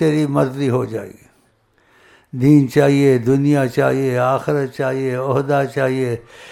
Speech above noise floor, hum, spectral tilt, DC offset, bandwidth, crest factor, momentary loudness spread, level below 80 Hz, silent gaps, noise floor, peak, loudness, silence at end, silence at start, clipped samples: 42 dB; none; -7.5 dB/octave; under 0.1%; 15 kHz; 16 dB; 10 LU; -54 dBFS; none; -58 dBFS; 0 dBFS; -17 LUFS; 0 s; 0 s; under 0.1%